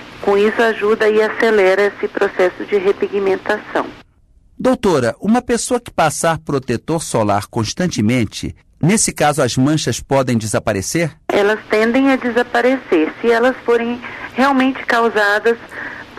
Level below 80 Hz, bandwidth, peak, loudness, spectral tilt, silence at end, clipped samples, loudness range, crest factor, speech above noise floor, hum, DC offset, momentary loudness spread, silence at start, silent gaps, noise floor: -46 dBFS; 13.5 kHz; -4 dBFS; -16 LUFS; -4.5 dB/octave; 0 s; under 0.1%; 3 LU; 12 dB; 35 dB; none; under 0.1%; 7 LU; 0 s; none; -50 dBFS